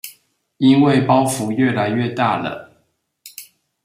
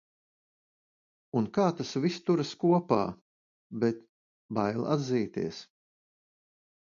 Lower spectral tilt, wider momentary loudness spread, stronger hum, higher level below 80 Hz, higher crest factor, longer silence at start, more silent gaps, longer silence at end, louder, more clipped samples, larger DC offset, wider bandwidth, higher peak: about the same, -6 dB/octave vs -7 dB/octave; first, 23 LU vs 10 LU; neither; first, -60 dBFS vs -68 dBFS; second, 16 dB vs 22 dB; second, 0.05 s vs 1.35 s; second, none vs 3.21-3.70 s, 4.09-4.49 s; second, 0.4 s vs 1.25 s; first, -17 LUFS vs -30 LUFS; neither; neither; first, 16 kHz vs 7.4 kHz; first, -2 dBFS vs -10 dBFS